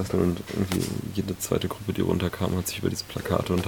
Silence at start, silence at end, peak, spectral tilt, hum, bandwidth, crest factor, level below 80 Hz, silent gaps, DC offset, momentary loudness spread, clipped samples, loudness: 0 s; 0 s; -6 dBFS; -5.5 dB/octave; none; over 20 kHz; 22 dB; -48 dBFS; none; under 0.1%; 5 LU; under 0.1%; -28 LUFS